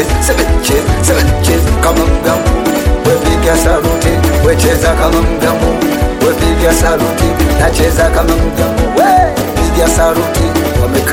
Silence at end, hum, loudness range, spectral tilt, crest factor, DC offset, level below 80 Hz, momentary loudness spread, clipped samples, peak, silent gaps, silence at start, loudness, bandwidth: 0 s; none; 0 LU; -5 dB/octave; 10 dB; under 0.1%; -16 dBFS; 3 LU; under 0.1%; 0 dBFS; none; 0 s; -11 LUFS; 17.5 kHz